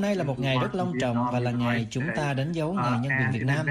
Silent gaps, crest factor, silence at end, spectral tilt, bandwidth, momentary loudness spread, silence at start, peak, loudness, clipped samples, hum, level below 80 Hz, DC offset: none; 12 dB; 0 s; -6.5 dB/octave; 11.5 kHz; 3 LU; 0 s; -14 dBFS; -26 LUFS; under 0.1%; none; -54 dBFS; under 0.1%